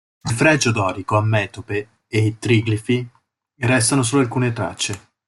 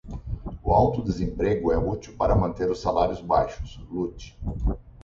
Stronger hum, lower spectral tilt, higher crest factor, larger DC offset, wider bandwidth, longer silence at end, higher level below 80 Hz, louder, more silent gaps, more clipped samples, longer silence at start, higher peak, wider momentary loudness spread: neither; second, -5 dB/octave vs -8 dB/octave; about the same, 18 dB vs 18 dB; neither; first, 12 kHz vs 7.6 kHz; first, 0.3 s vs 0 s; second, -52 dBFS vs -34 dBFS; first, -19 LUFS vs -25 LUFS; neither; neither; first, 0.25 s vs 0.05 s; first, -2 dBFS vs -6 dBFS; second, 9 LU vs 13 LU